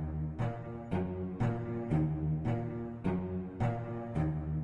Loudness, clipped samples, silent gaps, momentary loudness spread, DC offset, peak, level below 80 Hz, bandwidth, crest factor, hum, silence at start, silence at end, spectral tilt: -36 LUFS; under 0.1%; none; 6 LU; under 0.1%; -20 dBFS; -50 dBFS; 7 kHz; 14 dB; none; 0 s; 0 s; -10 dB/octave